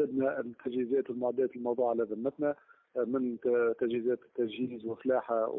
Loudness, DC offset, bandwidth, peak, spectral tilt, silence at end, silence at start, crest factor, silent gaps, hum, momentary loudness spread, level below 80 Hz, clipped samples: -32 LUFS; under 0.1%; 3.9 kHz; -18 dBFS; -10 dB/octave; 0 s; 0 s; 14 dB; none; none; 7 LU; -76 dBFS; under 0.1%